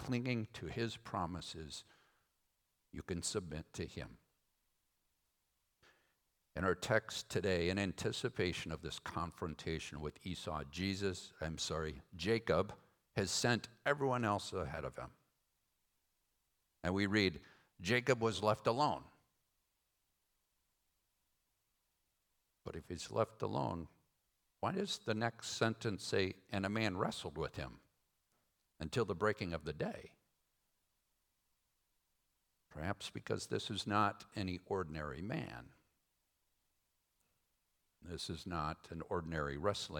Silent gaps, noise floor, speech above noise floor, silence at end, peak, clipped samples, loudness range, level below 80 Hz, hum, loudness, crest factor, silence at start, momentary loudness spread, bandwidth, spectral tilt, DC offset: none; -84 dBFS; 44 dB; 0 s; -18 dBFS; under 0.1%; 11 LU; -64 dBFS; none; -40 LUFS; 24 dB; 0 s; 13 LU; 19 kHz; -4.5 dB/octave; under 0.1%